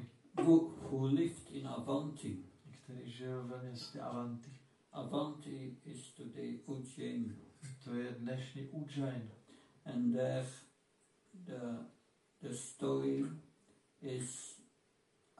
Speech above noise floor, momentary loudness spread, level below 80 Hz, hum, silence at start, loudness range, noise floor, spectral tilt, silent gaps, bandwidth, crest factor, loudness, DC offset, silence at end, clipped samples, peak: 36 dB; 17 LU; -82 dBFS; none; 0 s; 4 LU; -75 dBFS; -6.5 dB/octave; none; 11.5 kHz; 24 dB; -40 LUFS; under 0.1%; 0.75 s; under 0.1%; -18 dBFS